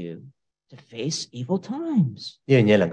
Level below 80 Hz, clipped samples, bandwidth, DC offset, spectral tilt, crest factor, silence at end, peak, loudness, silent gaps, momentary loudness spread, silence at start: -68 dBFS; under 0.1%; 9.6 kHz; under 0.1%; -6 dB/octave; 18 dB; 0 s; -6 dBFS; -23 LUFS; none; 20 LU; 0 s